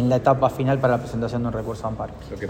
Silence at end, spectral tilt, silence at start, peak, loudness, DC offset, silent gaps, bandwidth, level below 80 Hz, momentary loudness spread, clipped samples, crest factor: 0 s; -8 dB/octave; 0 s; -4 dBFS; -23 LUFS; under 0.1%; none; 15.5 kHz; -42 dBFS; 11 LU; under 0.1%; 18 dB